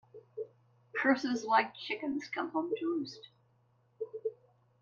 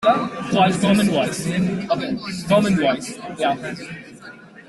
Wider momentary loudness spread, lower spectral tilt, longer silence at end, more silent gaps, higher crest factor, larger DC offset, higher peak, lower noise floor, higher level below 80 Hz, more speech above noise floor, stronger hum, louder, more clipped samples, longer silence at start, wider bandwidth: about the same, 16 LU vs 18 LU; second, -4 dB/octave vs -5.5 dB/octave; first, 0.5 s vs 0.05 s; neither; first, 22 dB vs 16 dB; neither; second, -14 dBFS vs -4 dBFS; first, -70 dBFS vs -41 dBFS; second, -82 dBFS vs -54 dBFS; first, 37 dB vs 22 dB; neither; second, -34 LUFS vs -20 LUFS; neither; first, 0.15 s vs 0 s; second, 7.6 kHz vs 12.5 kHz